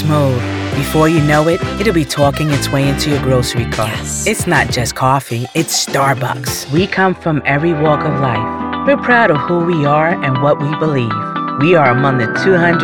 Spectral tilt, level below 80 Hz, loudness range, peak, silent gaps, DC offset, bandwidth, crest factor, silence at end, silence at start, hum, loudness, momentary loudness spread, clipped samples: -5 dB/octave; -36 dBFS; 2 LU; 0 dBFS; none; 0.1%; 19.5 kHz; 14 dB; 0 s; 0 s; none; -14 LUFS; 7 LU; under 0.1%